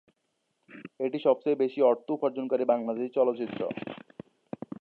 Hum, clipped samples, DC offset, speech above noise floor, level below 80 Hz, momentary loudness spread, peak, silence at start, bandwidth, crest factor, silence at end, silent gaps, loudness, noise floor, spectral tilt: none; under 0.1%; under 0.1%; 50 dB; -78 dBFS; 20 LU; -10 dBFS; 0.7 s; 4.5 kHz; 18 dB; 0 s; none; -28 LUFS; -78 dBFS; -9 dB/octave